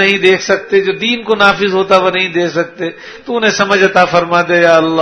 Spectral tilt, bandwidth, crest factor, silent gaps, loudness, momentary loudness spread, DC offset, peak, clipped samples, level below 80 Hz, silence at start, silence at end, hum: -4 dB/octave; 11 kHz; 12 dB; none; -11 LUFS; 9 LU; under 0.1%; 0 dBFS; 0.4%; -50 dBFS; 0 s; 0 s; none